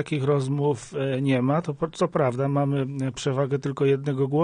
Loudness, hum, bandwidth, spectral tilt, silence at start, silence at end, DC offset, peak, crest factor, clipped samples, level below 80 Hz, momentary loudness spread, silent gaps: -25 LUFS; none; 10 kHz; -7.5 dB/octave; 0 s; 0 s; under 0.1%; -10 dBFS; 14 dB; under 0.1%; -60 dBFS; 5 LU; none